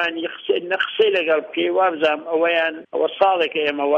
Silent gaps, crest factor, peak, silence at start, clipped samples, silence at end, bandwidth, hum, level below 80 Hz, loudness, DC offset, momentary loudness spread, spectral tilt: none; 16 dB; -4 dBFS; 0 s; under 0.1%; 0 s; 7 kHz; none; -70 dBFS; -20 LUFS; under 0.1%; 6 LU; -5 dB/octave